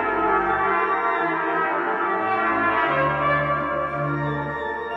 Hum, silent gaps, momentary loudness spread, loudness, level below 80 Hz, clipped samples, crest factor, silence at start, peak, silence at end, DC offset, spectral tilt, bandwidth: none; none; 5 LU; -22 LUFS; -48 dBFS; under 0.1%; 14 dB; 0 s; -8 dBFS; 0 s; under 0.1%; -8 dB/octave; 7.4 kHz